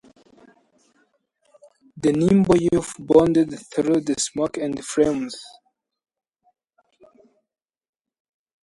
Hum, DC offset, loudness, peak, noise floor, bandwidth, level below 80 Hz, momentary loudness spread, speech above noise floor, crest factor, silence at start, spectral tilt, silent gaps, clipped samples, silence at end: none; under 0.1%; -20 LUFS; -2 dBFS; -67 dBFS; 11.5 kHz; -52 dBFS; 10 LU; 47 dB; 22 dB; 1.95 s; -6 dB/octave; none; under 0.1%; 3.15 s